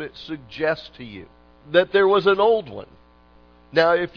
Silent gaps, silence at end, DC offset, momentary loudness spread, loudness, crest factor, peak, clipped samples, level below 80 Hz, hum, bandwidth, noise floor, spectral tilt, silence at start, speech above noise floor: none; 0.1 s; under 0.1%; 21 LU; -20 LUFS; 18 dB; -4 dBFS; under 0.1%; -56 dBFS; 60 Hz at -55 dBFS; 5.4 kHz; -52 dBFS; -6.5 dB/octave; 0 s; 32 dB